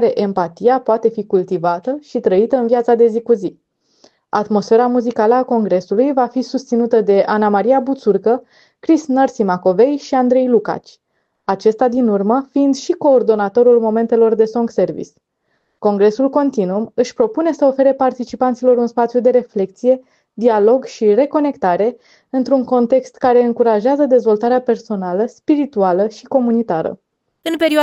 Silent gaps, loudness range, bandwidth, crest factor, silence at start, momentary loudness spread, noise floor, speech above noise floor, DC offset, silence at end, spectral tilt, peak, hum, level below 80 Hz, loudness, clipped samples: none; 2 LU; 11 kHz; 12 dB; 0 s; 7 LU; -66 dBFS; 52 dB; under 0.1%; 0 s; -6.5 dB/octave; -2 dBFS; none; -62 dBFS; -15 LUFS; under 0.1%